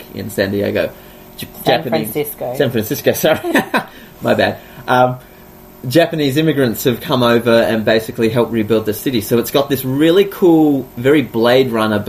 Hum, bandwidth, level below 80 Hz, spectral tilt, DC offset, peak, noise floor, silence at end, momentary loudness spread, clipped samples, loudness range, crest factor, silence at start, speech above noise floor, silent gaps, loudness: none; 15.5 kHz; -48 dBFS; -5.5 dB/octave; under 0.1%; 0 dBFS; -39 dBFS; 0 s; 9 LU; under 0.1%; 3 LU; 14 dB; 0 s; 25 dB; none; -15 LUFS